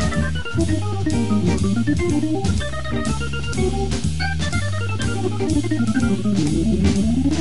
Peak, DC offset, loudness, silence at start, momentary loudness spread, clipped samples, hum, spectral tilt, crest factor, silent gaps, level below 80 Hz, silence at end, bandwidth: -6 dBFS; 4%; -21 LUFS; 0 s; 5 LU; under 0.1%; none; -6 dB/octave; 14 dB; none; -30 dBFS; 0 s; 11.5 kHz